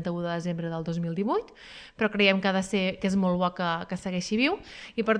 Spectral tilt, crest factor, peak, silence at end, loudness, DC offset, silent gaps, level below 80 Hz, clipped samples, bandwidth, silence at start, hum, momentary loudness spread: -5.5 dB/octave; 20 dB; -8 dBFS; 0 s; -27 LUFS; under 0.1%; none; -58 dBFS; under 0.1%; 10.5 kHz; 0 s; none; 11 LU